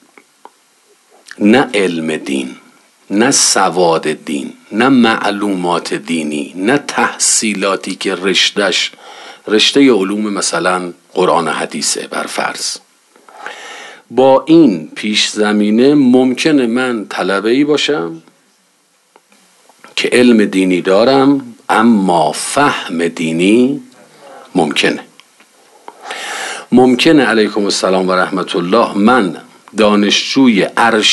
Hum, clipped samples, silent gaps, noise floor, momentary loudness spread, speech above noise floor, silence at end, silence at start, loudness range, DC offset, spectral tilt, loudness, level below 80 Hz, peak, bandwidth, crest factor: none; under 0.1%; none; -55 dBFS; 12 LU; 43 dB; 0 s; 1.4 s; 5 LU; under 0.1%; -3.5 dB/octave; -12 LUFS; -58 dBFS; 0 dBFS; 12.5 kHz; 14 dB